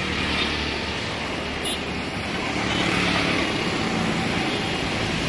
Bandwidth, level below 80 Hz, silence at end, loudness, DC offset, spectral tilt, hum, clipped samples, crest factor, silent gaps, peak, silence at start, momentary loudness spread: 11.5 kHz; -42 dBFS; 0 s; -24 LUFS; under 0.1%; -4 dB/octave; none; under 0.1%; 18 dB; none; -8 dBFS; 0 s; 6 LU